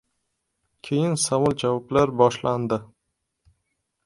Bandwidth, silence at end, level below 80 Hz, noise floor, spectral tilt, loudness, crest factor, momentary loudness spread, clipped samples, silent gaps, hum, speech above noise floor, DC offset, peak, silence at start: 11.5 kHz; 1.2 s; -56 dBFS; -78 dBFS; -5 dB/octave; -23 LUFS; 22 dB; 8 LU; under 0.1%; none; none; 56 dB; under 0.1%; -2 dBFS; 0.85 s